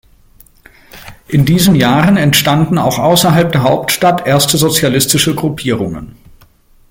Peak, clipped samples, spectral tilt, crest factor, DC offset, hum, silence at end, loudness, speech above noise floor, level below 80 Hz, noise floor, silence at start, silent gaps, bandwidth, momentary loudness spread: 0 dBFS; under 0.1%; -4.5 dB/octave; 12 dB; under 0.1%; none; 0.8 s; -11 LUFS; 35 dB; -40 dBFS; -46 dBFS; 0.95 s; none; 17.5 kHz; 8 LU